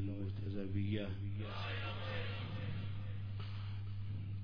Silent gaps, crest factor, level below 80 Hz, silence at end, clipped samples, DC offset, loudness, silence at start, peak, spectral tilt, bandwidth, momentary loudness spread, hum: none; 14 dB; -56 dBFS; 0 s; under 0.1%; under 0.1%; -43 LUFS; 0 s; -26 dBFS; -6 dB/octave; 5.2 kHz; 5 LU; none